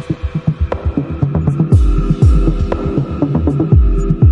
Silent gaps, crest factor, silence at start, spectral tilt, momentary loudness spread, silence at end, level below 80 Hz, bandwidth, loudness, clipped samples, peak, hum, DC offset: none; 12 dB; 0 s; -9.5 dB/octave; 7 LU; 0 s; -16 dBFS; 9 kHz; -15 LUFS; under 0.1%; 0 dBFS; none; under 0.1%